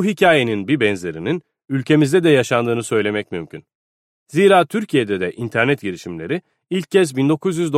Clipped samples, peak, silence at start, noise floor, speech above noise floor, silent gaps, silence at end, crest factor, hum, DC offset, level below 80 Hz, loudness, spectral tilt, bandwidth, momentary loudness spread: under 0.1%; 0 dBFS; 0 s; under -90 dBFS; over 73 dB; 3.75-4.26 s; 0 s; 16 dB; none; under 0.1%; -60 dBFS; -18 LUFS; -5.5 dB/octave; 15 kHz; 12 LU